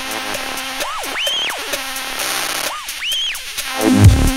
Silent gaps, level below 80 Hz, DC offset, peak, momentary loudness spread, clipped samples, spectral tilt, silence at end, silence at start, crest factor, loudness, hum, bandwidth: none; -26 dBFS; under 0.1%; 0 dBFS; 11 LU; 0.3%; -4 dB/octave; 0 s; 0 s; 18 dB; -18 LUFS; none; 16.5 kHz